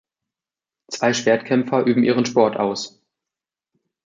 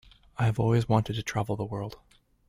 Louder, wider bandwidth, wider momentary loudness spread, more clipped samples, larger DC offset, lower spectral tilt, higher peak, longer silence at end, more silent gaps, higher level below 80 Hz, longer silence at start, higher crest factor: first, -19 LUFS vs -28 LUFS; second, 7.6 kHz vs 14 kHz; about the same, 11 LU vs 13 LU; neither; neither; second, -5 dB/octave vs -7 dB/octave; first, -2 dBFS vs -8 dBFS; first, 1.15 s vs 0.55 s; neither; second, -68 dBFS vs -54 dBFS; first, 0.9 s vs 0.4 s; about the same, 20 dB vs 20 dB